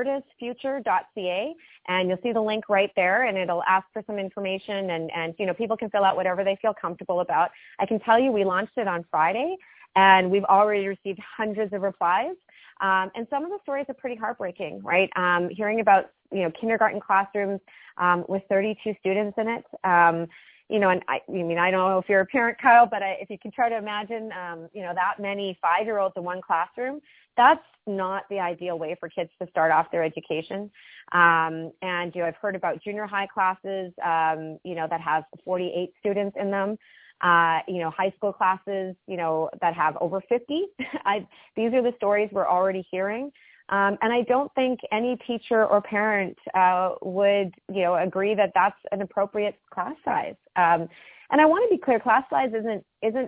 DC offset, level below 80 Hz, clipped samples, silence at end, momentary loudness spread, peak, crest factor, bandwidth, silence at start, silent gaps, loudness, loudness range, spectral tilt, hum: under 0.1%; -70 dBFS; under 0.1%; 0 s; 12 LU; -4 dBFS; 22 dB; 4 kHz; 0 s; none; -24 LUFS; 5 LU; -9 dB/octave; none